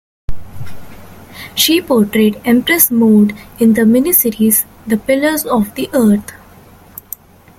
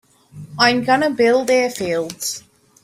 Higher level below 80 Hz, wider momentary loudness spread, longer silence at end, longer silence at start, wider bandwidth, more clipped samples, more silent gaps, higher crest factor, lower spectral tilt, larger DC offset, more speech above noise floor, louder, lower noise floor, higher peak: first, -38 dBFS vs -60 dBFS; first, 23 LU vs 11 LU; first, 1.25 s vs 0.45 s; about the same, 0.3 s vs 0.35 s; about the same, 17 kHz vs 16 kHz; neither; neither; about the same, 14 dB vs 18 dB; about the same, -4 dB/octave vs -3.5 dB/octave; neither; first, 29 dB vs 22 dB; first, -12 LUFS vs -17 LUFS; about the same, -41 dBFS vs -39 dBFS; about the same, 0 dBFS vs -2 dBFS